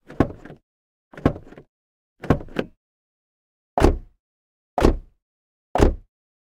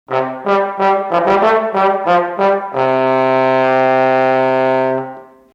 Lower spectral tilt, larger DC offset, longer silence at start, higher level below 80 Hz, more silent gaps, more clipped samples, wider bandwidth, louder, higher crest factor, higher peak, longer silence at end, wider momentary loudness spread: about the same, -7 dB/octave vs -7 dB/octave; neither; about the same, 0.1 s vs 0.1 s; first, -30 dBFS vs -56 dBFS; first, 0.63-1.11 s, 1.69-2.16 s, 2.77-3.77 s, 4.19-4.77 s, 5.22-5.75 s vs none; neither; first, 14.5 kHz vs 7.8 kHz; second, -24 LUFS vs -14 LUFS; first, 24 dB vs 12 dB; about the same, -2 dBFS vs -2 dBFS; first, 0.6 s vs 0.3 s; first, 19 LU vs 4 LU